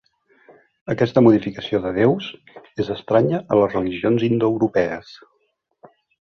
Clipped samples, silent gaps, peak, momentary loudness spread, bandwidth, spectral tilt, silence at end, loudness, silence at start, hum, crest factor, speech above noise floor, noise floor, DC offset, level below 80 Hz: under 0.1%; none; -2 dBFS; 13 LU; 6.6 kHz; -8.5 dB/octave; 1.15 s; -19 LUFS; 0.9 s; none; 18 dB; 50 dB; -69 dBFS; under 0.1%; -54 dBFS